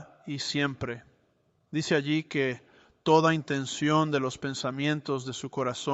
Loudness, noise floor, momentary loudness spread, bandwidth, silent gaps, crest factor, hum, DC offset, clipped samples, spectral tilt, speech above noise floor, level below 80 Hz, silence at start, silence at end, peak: -28 LUFS; -70 dBFS; 12 LU; 8.2 kHz; none; 20 dB; none; under 0.1%; under 0.1%; -5 dB/octave; 42 dB; -66 dBFS; 0 s; 0 s; -10 dBFS